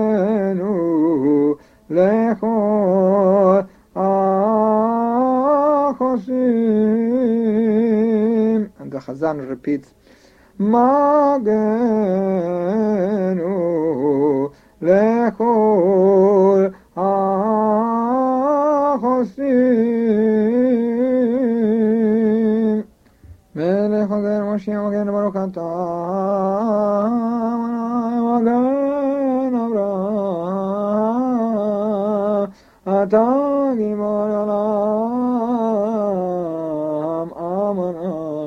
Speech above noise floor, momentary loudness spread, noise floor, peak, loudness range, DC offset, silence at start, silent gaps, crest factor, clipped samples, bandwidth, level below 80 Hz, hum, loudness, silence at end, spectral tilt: 33 dB; 8 LU; -49 dBFS; -2 dBFS; 4 LU; under 0.1%; 0 s; none; 16 dB; under 0.1%; 6.4 kHz; -58 dBFS; none; -18 LUFS; 0 s; -9.5 dB/octave